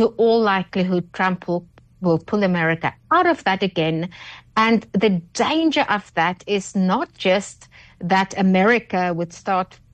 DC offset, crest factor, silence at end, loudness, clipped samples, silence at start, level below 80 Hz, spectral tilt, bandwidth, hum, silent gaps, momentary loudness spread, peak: under 0.1%; 14 dB; 0.3 s; -20 LUFS; under 0.1%; 0 s; -56 dBFS; -5.5 dB/octave; 9.2 kHz; none; none; 9 LU; -6 dBFS